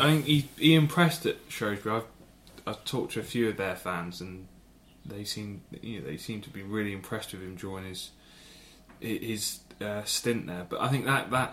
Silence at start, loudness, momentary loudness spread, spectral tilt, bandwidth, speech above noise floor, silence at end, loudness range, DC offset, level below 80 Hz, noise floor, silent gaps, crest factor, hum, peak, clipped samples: 0 s; -30 LUFS; 18 LU; -5 dB/octave; 16.5 kHz; 27 dB; 0 s; 10 LU; under 0.1%; -60 dBFS; -56 dBFS; none; 22 dB; none; -8 dBFS; under 0.1%